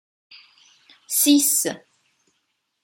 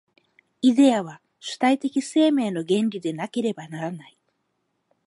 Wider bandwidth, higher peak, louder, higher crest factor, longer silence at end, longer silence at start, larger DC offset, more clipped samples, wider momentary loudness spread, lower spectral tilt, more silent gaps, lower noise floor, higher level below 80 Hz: first, 16.5 kHz vs 11.5 kHz; about the same, -6 dBFS vs -6 dBFS; first, -18 LUFS vs -23 LUFS; about the same, 20 dB vs 16 dB; about the same, 1.05 s vs 1.05 s; first, 1.1 s vs 0.65 s; neither; neither; second, 13 LU vs 16 LU; second, -1 dB/octave vs -5.5 dB/octave; neither; about the same, -73 dBFS vs -74 dBFS; about the same, -80 dBFS vs -76 dBFS